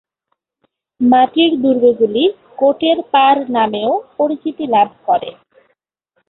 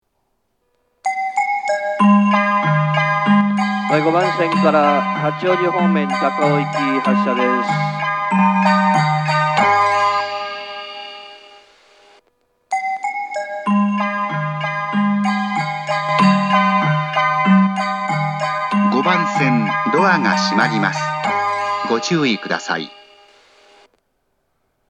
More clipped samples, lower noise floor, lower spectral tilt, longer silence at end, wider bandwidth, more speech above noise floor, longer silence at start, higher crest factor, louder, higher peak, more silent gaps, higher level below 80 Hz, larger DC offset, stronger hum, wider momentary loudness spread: neither; about the same, -71 dBFS vs -69 dBFS; first, -9.5 dB/octave vs -6 dB/octave; second, 1 s vs 1.95 s; second, 4.2 kHz vs 9.4 kHz; first, 58 dB vs 52 dB; about the same, 1 s vs 1.05 s; about the same, 14 dB vs 18 dB; first, -14 LUFS vs -17 LUFS; about the same, -2 dBFS vs 0 dBFS; neither; first, -62 dBFS vs -76 dBFS; neither; neither; about the same, 7 LU vs 9 LU